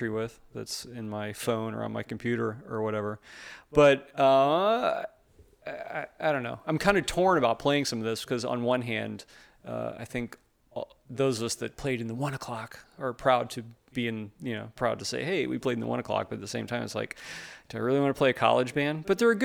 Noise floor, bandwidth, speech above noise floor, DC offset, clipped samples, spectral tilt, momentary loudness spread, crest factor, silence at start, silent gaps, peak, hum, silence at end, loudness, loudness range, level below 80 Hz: -59 dBFS; 19.5 kHz; 30 dB; under 0.1%; under 0.1%; -5 dB/octave; 16 LU; 22 dB; 0 s; none; -6 dBFS; none; 0 s; -29 LUFS; 7 LU; -58 dBFS